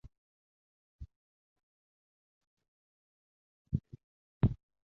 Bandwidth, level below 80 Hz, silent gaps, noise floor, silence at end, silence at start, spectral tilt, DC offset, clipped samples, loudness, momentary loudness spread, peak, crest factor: 4.1 kHz; -52 dBFS; 0.18-0.99 s, 1.16-1.56 s, 1.63-2.41 s, 2.47-2.57 s, 2.68-3.65 s, 4.04-4.41 s; under -90 dBFS; 0.3 s; 0.05 s; -10.5 dB/octave; under 0.1%; under 0.1%; -36 LUFS; 24 LU; -16 dBFS; 26 dB